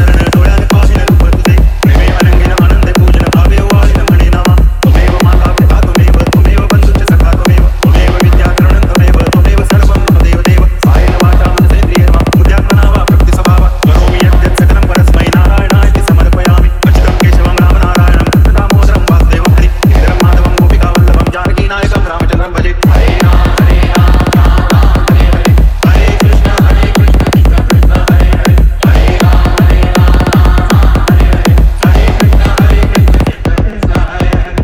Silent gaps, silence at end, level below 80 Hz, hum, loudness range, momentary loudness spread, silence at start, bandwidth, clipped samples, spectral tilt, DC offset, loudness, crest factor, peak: none; 0 s; -8 dBFS; none; 1 LU; 1 LU; 0 s; 15 kHz; 0.1%; -6.5 dB/octave; under 0.1%; -8 LUFS; 6 dB; 0 dBFS